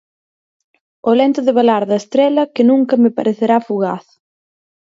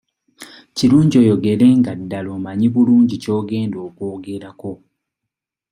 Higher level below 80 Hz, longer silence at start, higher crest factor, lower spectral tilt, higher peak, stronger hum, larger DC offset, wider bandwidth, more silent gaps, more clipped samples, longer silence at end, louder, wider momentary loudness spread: second, -68 dBFS vs -56 dBFS; first, 1.05 s vs 0.4 s; about the same, 14 dB vs 14 dB; about the same, -6.5 dB/octave vs -7.5 dB/octave; about the same, 0 dBFS vs -2 dBFS; neither; neither; second, 7.6 kHz vs 11.5 kHz; neither; neither; about the same, 0.85 s vs 0.95 s; about the same, -14 LUFS vs -16 LUFS; second, 7 LU vs 17 LU